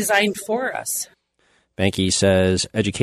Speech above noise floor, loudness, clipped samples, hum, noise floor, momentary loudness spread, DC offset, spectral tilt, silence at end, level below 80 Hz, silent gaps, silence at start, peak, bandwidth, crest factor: 43 dB; -20 LUFS; under 0.1%; none; -63 dBFS; 8 LU; under 0.1%; -4 dB/octave; 0 s; -50 dBFS; none; 0 s; -2 dBFS; 13.5 kHz; 18 dB